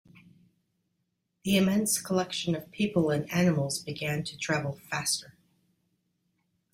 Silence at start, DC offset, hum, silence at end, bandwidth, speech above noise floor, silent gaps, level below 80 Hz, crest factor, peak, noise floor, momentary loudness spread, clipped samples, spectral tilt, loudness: 1.45 s; under 0.1%; none; 1.45 s; 16 kHz; 51 dB; none; -64 dBFS; 18 dB; -12 dBFS; -79 dBFS; 7 LU; under 0.1%; -4.5 dB/octave; -29 LUFS